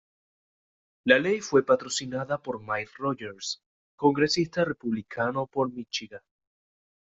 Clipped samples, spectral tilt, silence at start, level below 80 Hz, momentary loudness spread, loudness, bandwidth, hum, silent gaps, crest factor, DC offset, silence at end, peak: under 0.1%; -4 dB/octave; 1.05 s; -66 dBFS; 11 LU; -27 LUFS; 8 kHz; none; 3.66-3.98 s; 24 dB; under 0.1%; 0.85 s; -4 dBFS